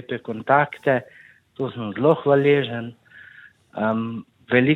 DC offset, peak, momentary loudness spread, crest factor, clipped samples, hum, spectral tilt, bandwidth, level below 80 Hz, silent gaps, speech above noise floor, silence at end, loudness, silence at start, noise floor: under 0.1%; -2 dBFS; 14 LU; 20 dB; under 0.1%; none; -8.5 dB/octave; 4.2 kHz; -66 dBFS; none; 28 dB; 0 s; -22 LUFS; 0.1 s; -48 dBFS